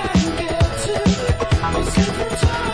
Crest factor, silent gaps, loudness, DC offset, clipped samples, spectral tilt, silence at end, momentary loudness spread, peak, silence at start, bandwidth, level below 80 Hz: 14 dB; none; -19 LUFS; under 0.1%; under 0.1%; -5.5 dB/octave; 0 s; 2 LU; -4 dBFS; 0 s; 11 kHz; -26 dBFS